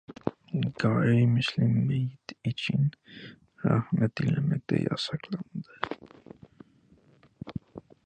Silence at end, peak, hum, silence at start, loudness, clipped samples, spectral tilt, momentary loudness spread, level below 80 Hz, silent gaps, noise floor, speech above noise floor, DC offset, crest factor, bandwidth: 0.25 s; -10 dBFS; none; 0.1 s; -28 LUFS; under 0.1%; -7.5 dB/octave; 18 LU; -60 dBFS; none; -61 dBFS; 34 dB; under 0.1%; 20 dB; 9 kHz